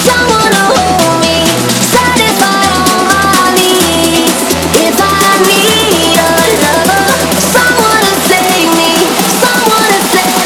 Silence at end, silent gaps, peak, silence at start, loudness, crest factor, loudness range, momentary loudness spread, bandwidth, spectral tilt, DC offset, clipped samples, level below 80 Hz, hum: 0 s; none; 0 dBFS; 0 s; -7 LUFS; 8 dB; 1 LU; 2 LU; over 20 kHz; -2.5 dB/octave; under 0.1%; 0.6%; -34 dBFS; none